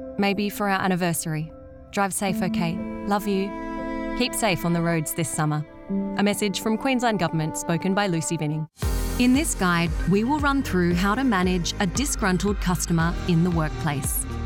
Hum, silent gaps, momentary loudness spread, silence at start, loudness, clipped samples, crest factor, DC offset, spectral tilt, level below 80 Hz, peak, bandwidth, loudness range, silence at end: none; none; 7 LU; 0 s; -24 LUFS; under 0.1%; 14 dB; under 0.1%; -5 dB/octave; -36 dBFS; -8 dBFS; 18 kHz; 3 LU; 0 s